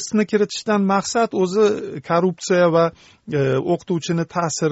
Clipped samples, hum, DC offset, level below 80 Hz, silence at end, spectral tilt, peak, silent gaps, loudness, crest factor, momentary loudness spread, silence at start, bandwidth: under 0.1%; none; under 0.1%; -60 dBFS; 0 s; -5.5 dB/octave; -4 dBFS; none; -20 LUFS; 14 dB; 6 LU; 0 s; 8.2 kHz